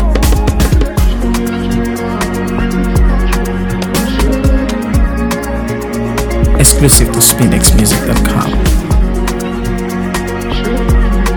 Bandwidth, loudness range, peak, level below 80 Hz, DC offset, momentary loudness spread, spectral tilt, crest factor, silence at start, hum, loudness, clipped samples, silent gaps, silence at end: over 20 kHz; 5 LU; 0 dBFS; -14 dBFS; under 0.1%; 9 LU; -4.5 dB/octave; 10 dB; 0 s; none; -12 LUFS; 0.5%; none; 0 s